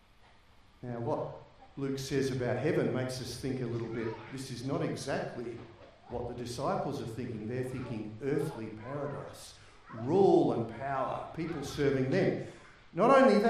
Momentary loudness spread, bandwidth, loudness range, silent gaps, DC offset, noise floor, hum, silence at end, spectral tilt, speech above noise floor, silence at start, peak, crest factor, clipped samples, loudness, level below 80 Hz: 16 LU; 15 kHz; 7 LU; none; under 0.1%; -60 dBFS; none; 0 s; -6.5 dB/octave; 29 dB; 0.85 s; -12 dBFS; 20 dB; under 0.1%; -33 LUFS; -60 dBFS